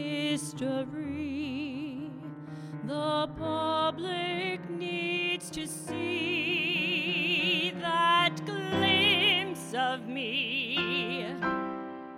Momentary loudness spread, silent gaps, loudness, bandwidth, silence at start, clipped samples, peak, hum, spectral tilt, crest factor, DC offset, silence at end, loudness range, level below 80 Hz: 12 LU; none; -29 LUFS; 16.5 kHz; 0 s; under 0.1%; -12 dBFS; none; -4 dB/octave; 18 dB; under 0.1%; 0 s; 7 LU; -64 dBFS